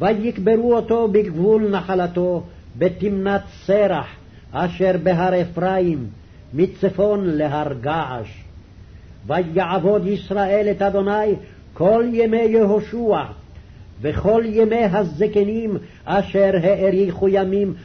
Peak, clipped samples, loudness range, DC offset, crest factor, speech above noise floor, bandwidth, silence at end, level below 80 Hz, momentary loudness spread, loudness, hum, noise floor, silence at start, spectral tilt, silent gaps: -6 dBFS; under 0.1%; 4 LU; under 0.1%; 12 dB; 23 dB; 6.4 kHz; 0 s; -44 dBFS; 9 LU; -19 LUFS; none; -41 dBFS; 0 s; -8.5 dB/octave; none